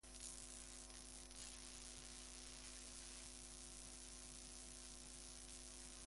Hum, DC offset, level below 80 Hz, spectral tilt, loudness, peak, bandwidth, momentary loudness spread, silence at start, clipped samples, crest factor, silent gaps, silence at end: none; under 0.1%; -64 dBFS; -1.5 dB/octave; -55 LUFS; -34 dBFS; 11.5 kHz; 2 LU; 0.05 s; under 0.1%; 22 dB; none; 0 s